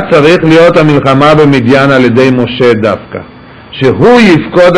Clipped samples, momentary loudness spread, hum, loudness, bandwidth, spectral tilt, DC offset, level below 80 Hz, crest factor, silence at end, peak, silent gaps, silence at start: 5%; 8 LU; none; -5 LUFS; 11 kHz; -7 dB/octave; under 0.1%; -36 dBFS; 6 dB; 0 s; 0 dBFS; none; 0 s